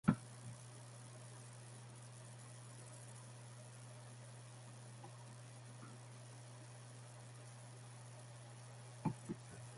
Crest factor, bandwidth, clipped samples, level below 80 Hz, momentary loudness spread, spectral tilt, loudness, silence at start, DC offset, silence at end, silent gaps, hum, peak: 34 dB; 11.5 kHz; under 0.1%; -74 dBFS; 10 LU; -5.5 dB/octave; -53 LUFS; 0.05 s; under 0.1%; 0 s; none; none; -16 dBFS